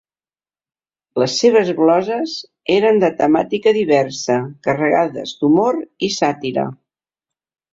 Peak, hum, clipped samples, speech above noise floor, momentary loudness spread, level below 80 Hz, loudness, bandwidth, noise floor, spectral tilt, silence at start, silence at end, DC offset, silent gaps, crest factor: -2 dBFS; none; under 0.1%; over 74 dB; 8 LU; -60 dBFS; -17 LUFS; 7.8 kHz; under -90 dBFS; -5 dB/octave; 1.15 s; 1 s; under 0.1%; none; 16 dB